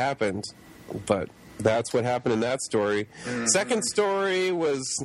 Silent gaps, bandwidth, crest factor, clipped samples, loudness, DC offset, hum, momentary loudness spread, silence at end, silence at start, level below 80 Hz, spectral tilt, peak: none; 14.5 kHz; 20 dB; under 0.1%; -26 LUFS; under 0.1%; none; 11 LU; 0 s; 0 s; -60 dBFS; -3.5 dB/octave; -8 dBFS